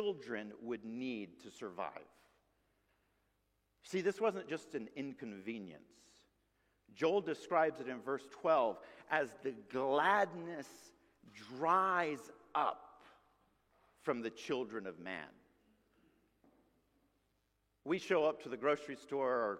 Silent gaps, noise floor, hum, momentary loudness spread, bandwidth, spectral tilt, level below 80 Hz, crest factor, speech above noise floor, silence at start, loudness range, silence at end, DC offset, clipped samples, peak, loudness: none; -80 dBFS; none; 15 LU; 14.5 kHz; -5 dB/octave; -82 dBFS; 22 dB; 42 dB; 0 s; 11 LU; 0 s; under 0.1%; under 0.1%; -18 dBFS; -38 LUFS